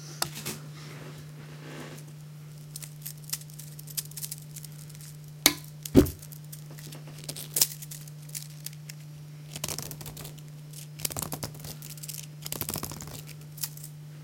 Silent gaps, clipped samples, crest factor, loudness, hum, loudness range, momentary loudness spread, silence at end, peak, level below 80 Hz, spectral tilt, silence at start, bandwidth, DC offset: none; under 0.1%; 34 dB; -33 LUFS; none; 11 LU; 20 LU; 0 s; 0 dBFS; -50 dBFS; -3.5 dB/octave; 0 s; 17 kHz; under 0.1%